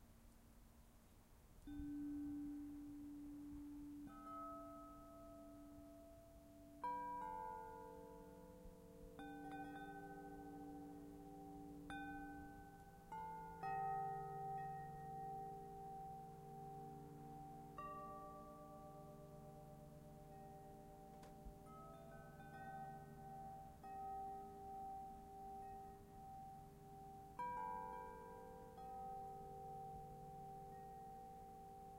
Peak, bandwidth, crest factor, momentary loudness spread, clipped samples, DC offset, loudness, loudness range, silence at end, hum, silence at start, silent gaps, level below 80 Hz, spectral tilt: -36 dBFS; 16 kHz; 18 dB; 12 LU; under 0.1%; under 0.1%; -54 LUFS; 7 LU; 0 s; none; 0 s; none; -68 dBFS; -6.5 dB/octave